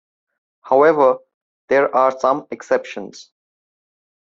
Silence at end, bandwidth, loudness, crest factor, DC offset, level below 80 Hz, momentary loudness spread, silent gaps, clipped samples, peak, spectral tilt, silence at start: 1.1 s; 7.6 kHz; -17 LUFS; 18 dB; under 0.1%; -66 dBFS; 16 LU; 1.34-1.68 s; under 0.1%; -2 dBFS; -5.5 dB/octave; 0.65 s